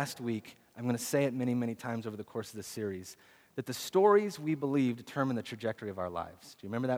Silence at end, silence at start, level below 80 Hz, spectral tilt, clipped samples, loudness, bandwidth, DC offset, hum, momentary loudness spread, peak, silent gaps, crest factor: 0 s; 0 s; -74 dBFS; -5.5 dB/octave; under 0.1%; -33 LUFS; over 20 kHz; under 0.1%; none; 15 LU; -12 dBFS; none; 20 dB